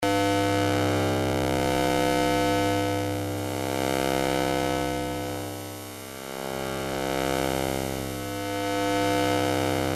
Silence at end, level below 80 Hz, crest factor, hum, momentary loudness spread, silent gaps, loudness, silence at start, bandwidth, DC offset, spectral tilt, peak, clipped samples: 0 s; -48 dBFS; 16 dB; none; 9 LU; none; -26 LUFS; 0 s; 16 kHz; under 0.1%; -4.5 dB/octave; -10 dBFS; under 0.1%